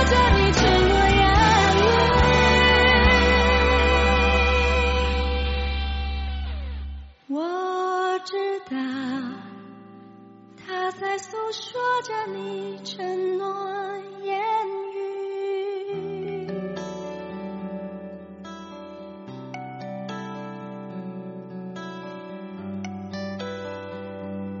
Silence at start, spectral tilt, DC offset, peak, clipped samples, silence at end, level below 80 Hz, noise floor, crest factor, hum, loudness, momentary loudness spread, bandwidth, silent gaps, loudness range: 0 s; -3.5 dB/octave; under 0.1%; -6 dBFS; under 0.1%; 0 s; -30 dBFS; -47 dBFS; 16 dB; none; -22 LUFS; 20 LU; 8 kHz; none; 19 LU